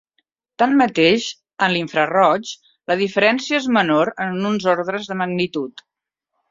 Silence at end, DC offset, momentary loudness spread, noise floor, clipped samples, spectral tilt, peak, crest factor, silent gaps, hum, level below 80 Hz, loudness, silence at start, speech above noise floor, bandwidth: 0.8 s; under 0.1%; 9 LU; -77 dBFS; under 0.1%; -5 dB/octave; -2 dBFS; 18 dB; none; none; -62 dBFS; -18 LUFS; 0.6 s; 59 dB; 7.8 kHz